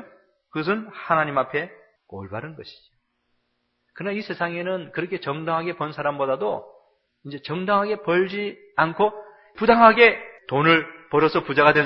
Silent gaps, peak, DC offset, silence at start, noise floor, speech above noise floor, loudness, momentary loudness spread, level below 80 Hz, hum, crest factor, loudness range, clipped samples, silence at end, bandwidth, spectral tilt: none; 0 dBFS; under 0.1%; 0 s; -72 dBFS; 51 dB; -21 LUFS; 18 LU; -60 dBFS; none; 22 dB; 12 LU; under 0.1%; 0 s; 6 kHz; -8 dB/octave